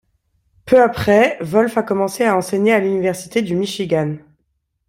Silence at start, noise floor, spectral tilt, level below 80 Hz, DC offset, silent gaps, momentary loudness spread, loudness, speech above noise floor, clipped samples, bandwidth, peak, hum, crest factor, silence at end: 0.65 s; -69 dBFS; -5.5 dB/octave; -50 dBFS; under 0.1%; none; 7 LU; -17 LUFS; 53 dB; under 0.1%; 16.5 kHz; -2 dBFS; none; 16 dB; 0.7 s